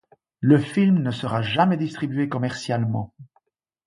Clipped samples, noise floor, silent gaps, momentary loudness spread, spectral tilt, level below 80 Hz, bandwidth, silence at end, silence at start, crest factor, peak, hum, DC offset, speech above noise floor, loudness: under 0.1%; -67 dBFS; none; 8 LU; -7 dB/octave; -58 dBFS; 11.5 kHz; 0.6 s; 0.4 s; 18 dB; -4 dBFS; none; under 0.1%; 46 dB; -22 LUFS